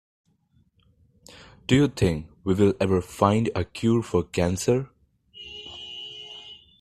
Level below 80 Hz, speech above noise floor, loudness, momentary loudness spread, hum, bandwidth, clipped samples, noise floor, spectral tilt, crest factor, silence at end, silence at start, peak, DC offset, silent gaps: -50 dBFS; 42 dB; -24 LUFS; 18 LU; none; 14 kHz; under 0.1%; -65 dBFS; -6 dB/octave; 22 dB; 0.25 s; 1.7 s; -4 dBFS; under 0.1%; none